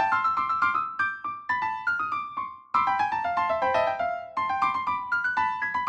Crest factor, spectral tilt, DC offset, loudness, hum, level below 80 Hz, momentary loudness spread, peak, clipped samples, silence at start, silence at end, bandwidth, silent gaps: 16 dB; -4 dB/octave; under 0.1%; -26 LUFS; none; -64 dBFS; 6 LU; -10 dBFS; under 0.1%; 0 s; 0 s; 8.8 kHz; none